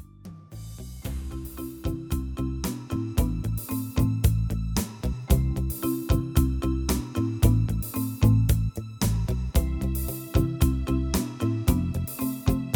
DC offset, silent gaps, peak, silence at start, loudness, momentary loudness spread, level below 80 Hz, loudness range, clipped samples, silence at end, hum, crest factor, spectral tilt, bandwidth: under 0.1%; none; -8 dBFS; 0 s; -27 LUFS; 12 LU; -30 dBFS; 6 LU; under 0.1%; 0 s; none; 18 dB; -6.5 dB/octave; over 20 kHz